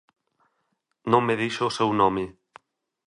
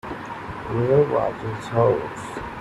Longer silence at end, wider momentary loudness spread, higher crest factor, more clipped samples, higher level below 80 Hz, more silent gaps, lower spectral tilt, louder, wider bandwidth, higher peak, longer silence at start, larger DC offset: first, 0.8 s vs 0 s; about the same, 12 LU vs 14 LU; about the same, 22 dB vs 18 dB; neither; second, -60 dBFS vs -48 dBFS; neither; second, -5.5 dB/octave vs -7.5 dB/octave; about the same, -23 LUFS vs -23 LUFS; about the same, 11 kHz vs 12 kHz; about the same, -4 dBFS vs -4 dBFS; first, 1.05 s vs 0.05 s; neither